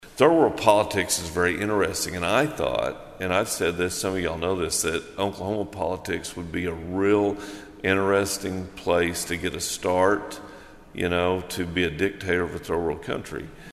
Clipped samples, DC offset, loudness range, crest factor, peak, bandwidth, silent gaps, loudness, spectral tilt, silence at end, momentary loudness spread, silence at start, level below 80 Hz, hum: under 0.1%; under 0.1%; 3 LU; 24 dB; -2 dBFS; 14.5 kHz; none; -25 LUFS; -4 dB/octave; 0 s; 10 LU; 0 s; -48 dBFS; none